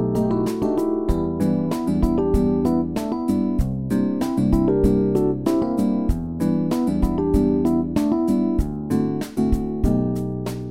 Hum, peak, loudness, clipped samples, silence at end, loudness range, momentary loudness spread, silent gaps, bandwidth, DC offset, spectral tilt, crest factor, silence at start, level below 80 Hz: none; -6 dBFS; -21 LUFS; under 0.1%; 0 s; 1 LU; 5 LU; none; 16.5 kHz; 0.6%; -8.5 dB/octave; 14 dB; 0 s; -30 dBFS